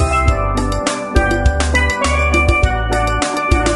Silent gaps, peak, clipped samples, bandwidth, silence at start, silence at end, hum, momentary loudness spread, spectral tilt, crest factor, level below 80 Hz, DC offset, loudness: none; 0 dBFS; under 0.1%; 12 kHz; 0 s; 0 s; none; 4 LU; -5 dB/octave; 14 dB; -18 dBFS; under 0.1%; -15 LUFS